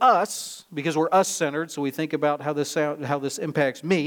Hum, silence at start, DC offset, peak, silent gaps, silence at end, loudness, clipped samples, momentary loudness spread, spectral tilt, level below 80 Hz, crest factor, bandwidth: none; 0 s; under 0.1%; -6 dBFS; none; 0 s; -25 LUFS; under 0.1%; 8 LU; -4.5 dB/octave; -76 dBFS; 18 dB; 19.5 kHz